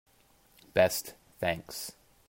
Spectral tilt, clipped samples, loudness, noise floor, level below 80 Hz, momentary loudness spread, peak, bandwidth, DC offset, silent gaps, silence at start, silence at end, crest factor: -3.5 dB/octave; under 0.1%; -31 LUFS; -64 dBFS; -62 dBFS; 15 LU; -12 dBFS; 16.5 kHz; under 0.1%; none; 0.75 s; 0.35 s; 22 dB